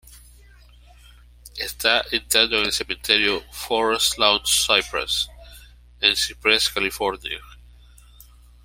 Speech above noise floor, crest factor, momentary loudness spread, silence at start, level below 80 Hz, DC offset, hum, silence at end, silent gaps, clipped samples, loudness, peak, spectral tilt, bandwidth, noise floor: 27 dB; 24 dB; 13 LU; 0.1 s; -46 dBFS; under 0.1%; 60 Hz at -45 dBFS; 1.1 s; none; under 0.1%; -20 LUFS; 0 dBFS; -0.5 dB/octave; 16.5 kHz; -49 dBFS